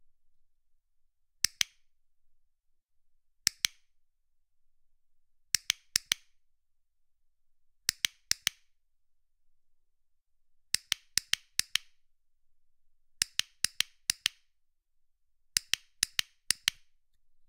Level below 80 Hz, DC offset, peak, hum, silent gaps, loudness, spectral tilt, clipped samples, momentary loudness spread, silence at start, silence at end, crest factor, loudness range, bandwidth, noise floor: -68 dBFS; under 0.1%; -2 dBFS; none; none; -32 LUFS; 2.5 dB/octave; under 0.1%; 4 LU; 1.45 s; 0.8 s; 36 dB; 4 LU; 16 kHz; -71 dBFS